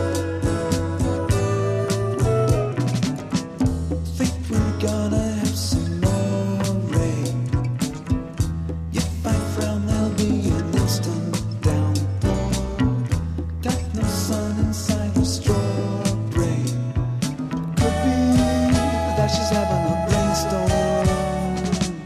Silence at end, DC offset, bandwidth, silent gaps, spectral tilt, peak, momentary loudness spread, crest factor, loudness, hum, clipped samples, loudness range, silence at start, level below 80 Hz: 0 s; under 0.1%; 14 kHz; none; -6 dB/octave; -4 dBFS; 5 LU; 16 dB; -22 LUFS; none; under 0.1%; 3 LU; 0 s; -32 dBFS